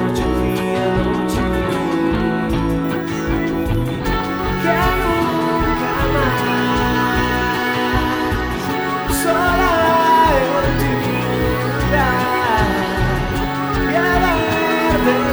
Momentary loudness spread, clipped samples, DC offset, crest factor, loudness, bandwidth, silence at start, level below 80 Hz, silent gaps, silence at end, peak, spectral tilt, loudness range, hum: 5 LU; under 0.1%; under 0.1%; 14 dB; -17 LUFS; over 20 kHz; 0 s; -28 dBFS; none; 0 s; -2 dBFS; -5.5 dB/octave; 3 LU; none